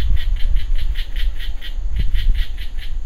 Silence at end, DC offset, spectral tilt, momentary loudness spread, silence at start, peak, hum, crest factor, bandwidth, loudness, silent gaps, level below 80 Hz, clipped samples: 0 s; under 0.1%; -5 dB/octave; 7 LU; 0 s; -2 dBFS; none; 12 dB; 4.9 kHz; -26 LUFS; none; -18 dBFS; under 0.1%